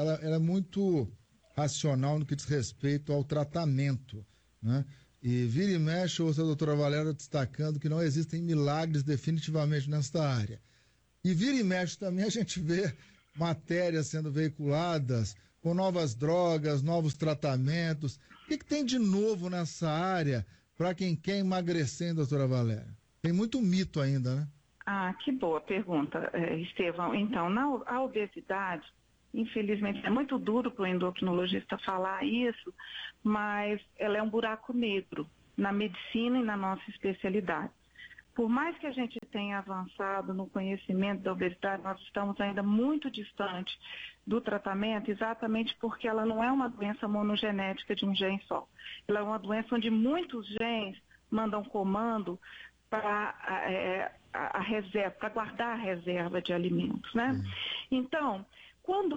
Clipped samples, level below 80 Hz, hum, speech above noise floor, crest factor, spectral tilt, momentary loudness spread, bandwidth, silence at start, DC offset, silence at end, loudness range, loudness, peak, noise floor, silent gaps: under 0.1%; -64 dBFS; none; 36 dB; 14 dB; -6 dB/octave; 8 LU; 8.4 kHz; 0 s; under 0.1%; 0 s; 3 LU; -32 LUFS; -18 dBFS; -68 dBFS; none